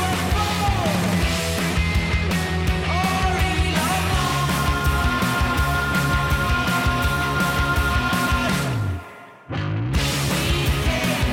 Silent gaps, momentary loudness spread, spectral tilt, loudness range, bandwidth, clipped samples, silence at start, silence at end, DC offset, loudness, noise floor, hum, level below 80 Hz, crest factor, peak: none; 2 LU; -4.5 dB/octave; 2 LU; 17 kHz; under 0.1%; 0 s; 0 s; under 0.1%; -21 LUFS; -41 dBFS; none; -28 dBFS; 12 dB; -10 dBFS